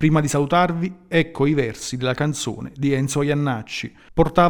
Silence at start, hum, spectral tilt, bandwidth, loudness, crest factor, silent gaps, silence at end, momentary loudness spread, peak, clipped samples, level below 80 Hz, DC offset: 0 s; none; -5.5 dB/octave; 19.5 kHz; -22 LUFS; 18 dB; none; 0 s; 8 LU; -2 dBFS; under 0.1%; -42 dBFS; under 0.1%